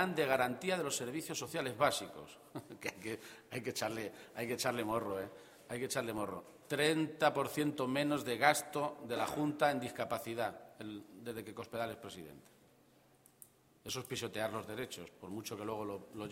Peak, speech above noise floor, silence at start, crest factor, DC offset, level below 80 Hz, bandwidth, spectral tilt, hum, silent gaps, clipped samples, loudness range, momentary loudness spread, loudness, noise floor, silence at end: -12 dBFS; 29 dB; 0 s; 26 dB; under 0.1%; -74 dBFS; 16.5 kHz; -4 dB/octave; none; none; under 0.1%; 10 LU; 15 LU; -38 LUFS; -67 dBFS; 0 s